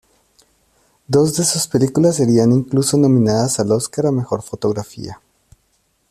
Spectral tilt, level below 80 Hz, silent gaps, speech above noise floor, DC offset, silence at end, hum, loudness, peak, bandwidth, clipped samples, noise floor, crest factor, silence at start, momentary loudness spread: -5.5 dB/octave; -52 dBFS; none; 48 dB; under 0.1%; 0.95 s; none; -16 LUFS; -2 dBFS; 14.5 kHz; under 0.1%; -63 dBFS; 16 dB; 1.1 s; 10 LU